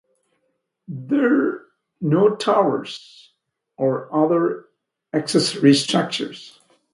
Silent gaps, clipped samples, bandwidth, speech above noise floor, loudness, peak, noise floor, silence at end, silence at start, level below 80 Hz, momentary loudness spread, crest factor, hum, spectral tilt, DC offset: none; under 0.1%; 11.5 kHz; 53 dB; -20 LUFS; 0 dBFS; -72 dBFS; 0.45 s; 0.9 s; -70 dBFS; 18 LU; 20 dB; none; -5.5 dB/octave; under 0.1%